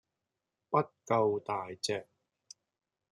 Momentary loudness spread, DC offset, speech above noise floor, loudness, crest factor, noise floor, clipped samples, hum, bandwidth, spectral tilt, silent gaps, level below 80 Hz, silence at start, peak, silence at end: 7 LU; under 0.1%; 55 dB; -33 LUFS; 22 dB; -88 dBFS; under 0.1%; none; 12 kHz; -4.5 dB/octave; none; -80 dBFS; 0.7 s; -14 dBFS; 1.1 s